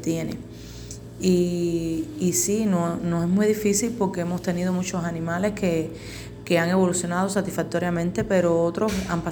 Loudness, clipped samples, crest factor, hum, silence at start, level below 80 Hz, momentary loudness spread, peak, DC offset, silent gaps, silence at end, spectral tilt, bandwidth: -24 LUFS; under 0.1%; 16 dB; none; 0 s; -48 dBFS; 12 LU; -8 dBFS; under 0.1%; none; 0 s; -5.5 dB/octave; over 20 kHz